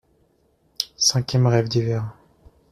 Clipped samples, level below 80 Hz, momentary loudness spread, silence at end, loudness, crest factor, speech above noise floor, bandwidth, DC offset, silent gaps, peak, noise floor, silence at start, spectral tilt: under 0.1%; -54 dBFS; 11 LU; 0.6 s; -21 LUFS; 20 dB; 43 dB; 14.5 kHz; under 0.1%; none; -4 dBFS; -63 dBFS; 0.8 s; -4.5 dB/octave